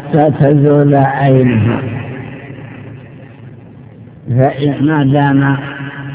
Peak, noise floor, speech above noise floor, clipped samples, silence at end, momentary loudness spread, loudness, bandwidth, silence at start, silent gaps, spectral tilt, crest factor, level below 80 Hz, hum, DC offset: 0 dBFS; -34 dBFS; 24 dB; 0.3%; 0 s; 21 LU; -11 LUFS; 4 kHz; 0 s; none; -12.5 dB/octave; 12 dB; -44 dBFS; none; under 0.1%